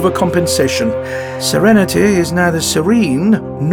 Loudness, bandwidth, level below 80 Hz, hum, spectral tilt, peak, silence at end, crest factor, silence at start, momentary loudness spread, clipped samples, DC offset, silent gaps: -13 LUFS; 19.5 kHz; -40 dBFS; none; -5 dB/octave; -2 dBFS; 0 s; 12 dB; 0 s; 7 LU; under 0.1%; under 0.1%; none